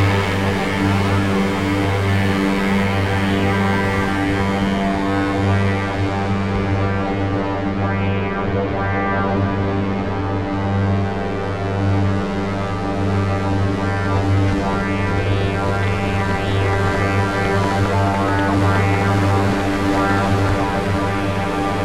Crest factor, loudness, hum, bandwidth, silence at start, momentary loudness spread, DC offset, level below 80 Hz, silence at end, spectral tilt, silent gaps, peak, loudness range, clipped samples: 14 dB; -19 LUFS; none; 13 kHz; 0 s; 4 LU; under 0.1%; -34 dBFS; 0 s; -7 dB/octave; none; -4 dBFS; 3 LU; under 0.1%